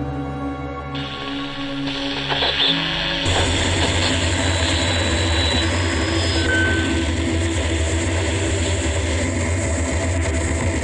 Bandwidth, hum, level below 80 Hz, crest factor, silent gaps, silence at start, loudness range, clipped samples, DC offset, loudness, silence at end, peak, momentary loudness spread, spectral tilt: 11 kHz; none; -32 dBFS; 16 dB; none; 0 s; 3 LU; under 0.1%; under 0.1%; -20 LUFS; 0 s; -4 dBFS; 9 LU; -4 dB/octave